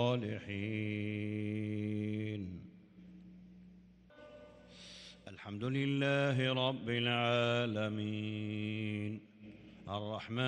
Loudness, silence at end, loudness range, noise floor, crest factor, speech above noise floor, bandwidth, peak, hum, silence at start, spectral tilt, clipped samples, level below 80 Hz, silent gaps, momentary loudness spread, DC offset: -36 LUFS; 0 s; 13 LU; -60 dBFS; 20 dB; 25 dB; 9.8 kHz; -18 dBFS; none; 0 s; -6.5 dB/octave; under 0.1%; -72 dBFS; none; 24 LU; under 0.1%